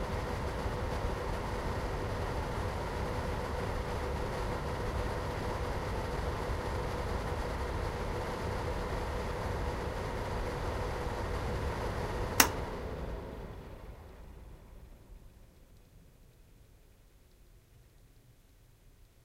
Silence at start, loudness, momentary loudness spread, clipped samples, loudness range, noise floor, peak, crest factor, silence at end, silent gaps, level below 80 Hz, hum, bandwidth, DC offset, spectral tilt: 0 s; -36 LUFS; 13 LU; under 0.1%; 12 LU; -61 dBFS; -2 dBFS; 34 dB; 0.35 s; none; -42 dBFS; none; 16 kHz; under 0.1%; -4.5 dB/octave